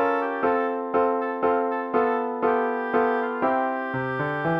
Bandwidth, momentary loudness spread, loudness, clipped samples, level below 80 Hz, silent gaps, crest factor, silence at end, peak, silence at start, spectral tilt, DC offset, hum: 5.6 kHz; 3 LU; -24 LUFS; under 0.1%; -64 dBFS; none; 16 dB; 0 s; -8 dBFS; 0 s; -8.5 dB/octave; under 0.1%; none